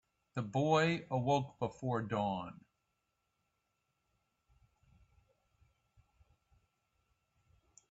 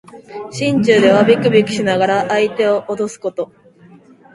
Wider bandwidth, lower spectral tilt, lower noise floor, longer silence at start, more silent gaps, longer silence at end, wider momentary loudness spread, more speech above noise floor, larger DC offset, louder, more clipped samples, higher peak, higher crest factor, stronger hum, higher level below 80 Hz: second, 8 kHz vs 11.5 kHz; about the same, -5.5 dB/octave vs -5.5 dB/octave; first, -84 dBFS vs -44 dBFS; first, 0.35 s vs 0.15 s; neither; first, 5.35 s vs 0.9 s; second, 13 LU vs 17 LU; first, 49 dB vs 30 dB; neither; second, -36 LUFS vs -14 LUFS; neither; second, -18 dBFS vs 0 dBFS; first, 24 dB vs 16 dB; neither; second, -72 dBFS vs -56 dBFS